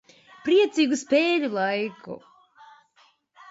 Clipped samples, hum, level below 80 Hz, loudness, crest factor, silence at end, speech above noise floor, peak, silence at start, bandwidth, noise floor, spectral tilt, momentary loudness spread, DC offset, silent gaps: under 0.1%; none; -76 dBFS; -23 LUFS; 16 dB; 1.3 s; 39 dB; -10 dBFS; 0.45 s; 8 kHz; -62 dBFS; -4 dB/octave; 20 LU; under 0.1%; none